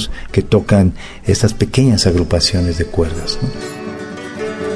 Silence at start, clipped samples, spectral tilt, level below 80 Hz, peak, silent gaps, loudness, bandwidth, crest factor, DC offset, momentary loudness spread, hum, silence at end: 0 s; under 0.1%; -5.5 dB/octave; -28 dBFS; 0 dBFS; none; -16 LUFS; 11 kHz; 14 dB; under 0.1%; 14 LU; none; 0 s